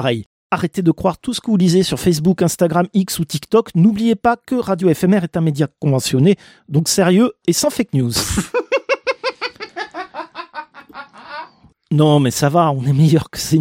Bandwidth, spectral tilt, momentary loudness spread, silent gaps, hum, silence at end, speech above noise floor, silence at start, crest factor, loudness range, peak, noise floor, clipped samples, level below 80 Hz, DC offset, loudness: 16.5 kHz; -5.5 dB/octave; 16 LU; 0.26-0.50 s; none; 0 s; 26 dB; 0 s; 14 dB; 6 LU; -2 dBFS; -42 dBFS; under 0.1%; -44 dBFS; under 0.1%; -16 LUFS